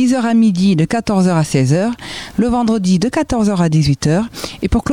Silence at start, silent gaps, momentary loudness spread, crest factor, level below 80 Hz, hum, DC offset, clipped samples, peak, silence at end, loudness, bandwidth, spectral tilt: 0 s; none; 7 LU; 12 dB; -32 dBFS; none; 0.5%; under 0.1%; -2 dBFS; 0 s; -15 LUFS; 16 kHz; -6.5 dB/octave